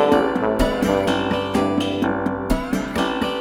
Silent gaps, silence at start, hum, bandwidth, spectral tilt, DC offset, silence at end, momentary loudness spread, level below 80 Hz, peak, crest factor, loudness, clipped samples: none; 0 s; none; 18.5 kHz; -5.5 dB/octave; under 0.1%; 0 s; 4 LU; -34 dBFS; -4 dBFS; 16 dB; -21 LUFS; under 0.1%